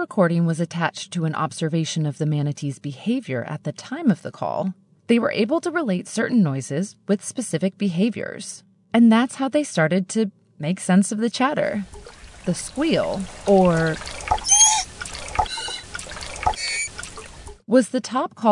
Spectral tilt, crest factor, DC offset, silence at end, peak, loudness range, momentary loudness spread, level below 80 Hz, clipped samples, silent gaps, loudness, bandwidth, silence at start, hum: -4.5 dB/octave; 18 dB; under 0.1%; 0 s; -4 dBFS; 6 LU; 14 LU; -46 dBFS; under 0.1%; none; -22 LUFS; 11 kHz; 0 s; none